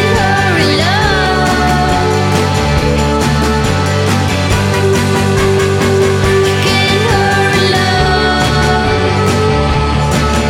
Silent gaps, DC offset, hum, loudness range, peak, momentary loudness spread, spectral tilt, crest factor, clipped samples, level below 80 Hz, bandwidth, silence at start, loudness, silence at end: none; under 0.1%; none; 1 LU; 0 dBFS; 2 LU; -5 dB/octave; 10 dB; under 0.1%; -22 dBFS; 16 kHz; 0 s; -11 LUFS; 0 s